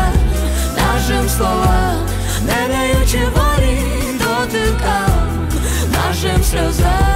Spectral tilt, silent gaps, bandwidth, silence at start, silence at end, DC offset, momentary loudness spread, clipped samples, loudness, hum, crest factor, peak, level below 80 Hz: -5 dB/octave; none; 16 kHz; 0 s; 0 s; under 0.1%; 3 LU; under 0.1%; -16 LUFS; none; 10 dB; -4 dBFS; -18 dBFS